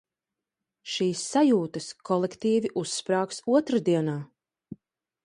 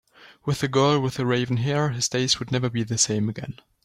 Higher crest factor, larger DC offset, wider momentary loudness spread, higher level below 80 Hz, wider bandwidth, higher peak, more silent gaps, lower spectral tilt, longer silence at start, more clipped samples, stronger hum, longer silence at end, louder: about the same, 16 dB vs 18 dB; neither; first, 12 LU vs 8 LU; second, -72 dBFS vs -56 dBFS; second, 11.5 kHz vs 14 kHz; second, -10 dBFS vs -6 dBFS; neither; about the same, -5 dB/octave vs -4.5 dB/octave; first, 0.85 s vs 0.2 s; neither; neither; first, 0.5 s vs 0.3 s; second, -26 LUFS vs -23 LUFS